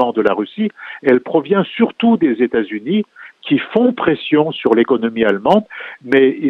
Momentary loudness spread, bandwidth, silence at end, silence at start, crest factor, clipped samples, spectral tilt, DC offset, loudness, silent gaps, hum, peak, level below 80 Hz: 8 LU; 5.6 kHz; 0 s; 0 s; 16 dB; under 0.1%; -8 dB/octave; under 0.1%; -16 LUFS; none; none; 0 dBFS; -58 dBFS